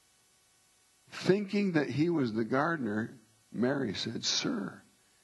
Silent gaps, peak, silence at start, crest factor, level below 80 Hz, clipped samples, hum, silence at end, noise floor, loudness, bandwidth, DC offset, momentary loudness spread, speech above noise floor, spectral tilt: none; -12 dBFS; 1.1 s; 22 dB; -72 dBFS; under 0.1%; none; 0.45 s; -67 dBFS; -31 LUFS; 12 kHz; under 0.1%; 10 LU; 36 dB; -5 dB/octave